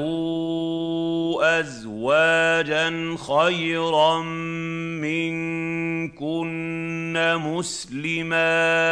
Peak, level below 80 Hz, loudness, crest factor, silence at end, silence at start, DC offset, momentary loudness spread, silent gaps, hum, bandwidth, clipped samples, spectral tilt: -6 dBFS; -58 dBFS; -23 LUFS; 16 dB; 0 s; 0 s; under 0.1%; 10 LU; none; none; 10.5 kHz; under 0.1%; -4.5 dB/octave